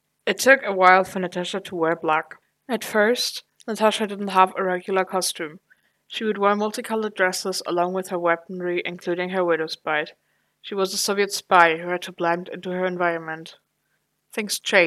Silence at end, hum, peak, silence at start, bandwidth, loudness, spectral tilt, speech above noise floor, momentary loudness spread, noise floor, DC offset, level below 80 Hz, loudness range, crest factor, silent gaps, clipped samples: 0 s; none; 0 dBFS; 0.25 s; 15.5 kHz; -22 LUFS; -3.5 dB/octave; 50 dB; 14 LU; -72 dBFS; under 0.1%; -76 dBFS; 3 LU; 22 dB; none; under 0.1%